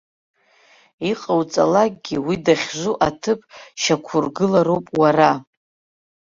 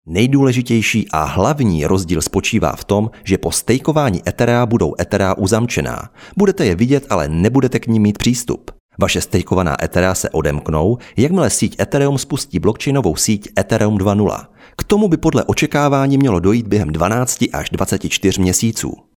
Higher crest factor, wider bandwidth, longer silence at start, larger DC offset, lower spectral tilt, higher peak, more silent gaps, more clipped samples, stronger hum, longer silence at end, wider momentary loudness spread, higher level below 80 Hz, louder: about the same, 18 dB vs 14 dB; second, 7.6 kHz vs 18 kHz; first, 1 s vs 0.05 s; neither; about the same, -5 dB/octave vs -5.5 dB/octave; about the same, -2 dBFS vs 0 dBFS; second, none vs 8.80-8.89 s; neither; neither; first, 0.95 s vs 0.2 s; first, 9 LU vs 5 LU; second, -56 dBFS vs -38 dBFS; second, -19 LUFS vs -16 LUFS